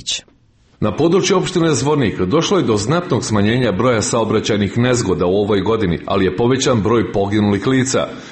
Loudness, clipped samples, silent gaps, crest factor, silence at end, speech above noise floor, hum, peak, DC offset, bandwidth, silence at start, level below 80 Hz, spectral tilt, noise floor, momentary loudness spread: -16 LUFS; under 0.1%; none; 12 dB; 0 s; 37 dB; none; -4 dBFS; under 0.1%; 8.8 kHz; 0 s; -42 dBFS; -5 dB/octave; -52 dBFS; 3 LU